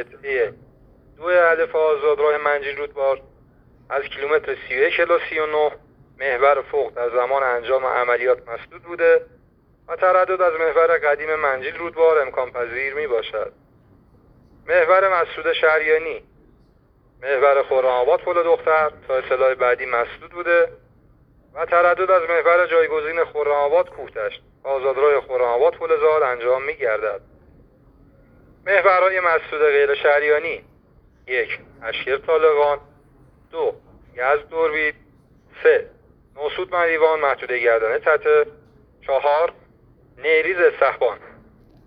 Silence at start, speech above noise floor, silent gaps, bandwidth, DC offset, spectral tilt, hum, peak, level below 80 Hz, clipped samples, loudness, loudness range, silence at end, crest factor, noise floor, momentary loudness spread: 0 s; 37 dB; none; 5.2 kHz; under 0.1%; -6.5 dB/octave; none; -2 dBFS; -56 dBFS; under 0.1%; -19 LUFS; 3 LU; 0.55 s; 18 dB; -56 dBFS; 12 LU